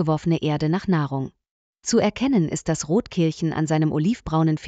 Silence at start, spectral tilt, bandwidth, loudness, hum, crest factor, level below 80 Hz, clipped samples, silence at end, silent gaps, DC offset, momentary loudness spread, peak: 0 s; -6 dB/octave; 9 kHz; -22 LUFS; none; 14 dB; -48 dBFS; under 0.1%; 0 s; 1.51-1.73 s; under 0.1%; 5 LU; -8 dBFS